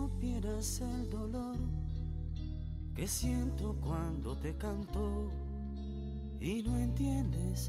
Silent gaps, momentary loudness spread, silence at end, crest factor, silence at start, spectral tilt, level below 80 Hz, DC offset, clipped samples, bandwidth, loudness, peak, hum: none; 8 LU; 0 s; 12 dB; 0 s; -6 dB/octave; -40 dBFS; under 0.1%; under 0.1%; 16 kHz; -38 LUFS; -24 dBFS; none